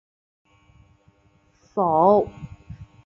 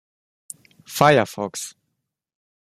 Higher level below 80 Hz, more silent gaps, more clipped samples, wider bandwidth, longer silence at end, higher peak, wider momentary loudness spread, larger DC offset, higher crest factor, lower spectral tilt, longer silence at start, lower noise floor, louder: first, -54 dBFS vs -60 dBFS; neither; neither; second, 7 kHz vs 15 kHz; second, 0.2 s vs 1.05 s; second, -4 dBFS vs 0 dBFS; about the same, 26 LU vs 24 LU; neither; about the same, 20 dB vs 24 dB; first, -10 dB/octave vs -4.5 dB/octave; first, 1.75 s vs 0.9 s; second, -61 dBFS vs -78 dBFS; about the same, -20 LUFS vs -19 LUFS